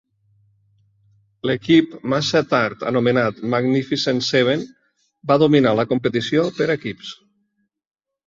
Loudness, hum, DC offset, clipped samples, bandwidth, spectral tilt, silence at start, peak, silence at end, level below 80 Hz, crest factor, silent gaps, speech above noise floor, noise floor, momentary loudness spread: -19 LUFS; none; under 0.1%; under 0.1%; 7.6 kHz; -6 dB/octave; 1.45 s; -2 dBFS; 1.15 s; -58 dBFS; 18 dB; none; 53 dB; -71 dBFS; 10 LU